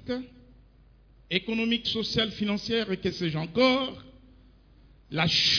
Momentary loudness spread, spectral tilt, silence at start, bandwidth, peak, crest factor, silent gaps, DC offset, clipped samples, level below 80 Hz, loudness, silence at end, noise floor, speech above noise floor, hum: 12 LU; -4.5 dB/octave; 0 s; 5.4 kHz; -8 dBFS; 20 dB; none; under 0.1%; under 0.1%; -54 dBFS; -27 LUFS; 0 s; -57 dBFS; 30 dB; none